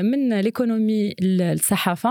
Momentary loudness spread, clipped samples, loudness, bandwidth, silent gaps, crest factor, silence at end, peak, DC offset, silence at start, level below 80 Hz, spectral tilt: 2 LU; under 0.1%; -21 LUFS; 19 kHz; none; 16 dB; 0 s; -4 dBFS; under 0.1%; 0 s; -62 dBFS; -5 dB/octave